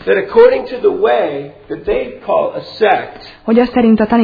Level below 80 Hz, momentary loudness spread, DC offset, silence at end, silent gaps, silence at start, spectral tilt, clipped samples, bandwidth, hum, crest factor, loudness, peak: -42 dBFS; 15 LU; under 0.1%; 0 s; none; 0 s; -8.5 dB/octave; 0.1%; 5 kHz; none; 12 dB; -13 LUFS; 0 dBFS